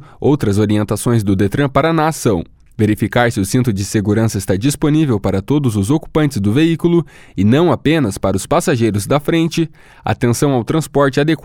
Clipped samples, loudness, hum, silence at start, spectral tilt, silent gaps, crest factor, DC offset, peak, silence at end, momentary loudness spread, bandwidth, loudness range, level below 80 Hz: under 0.1%; -15 LUFS; none; 0 s; -6 dB/octave; none; 14 dB; under 0.1%; 0 dBFS; 0.1 s; 4 LU; 17 kHz; 1 LU; -40 dBFS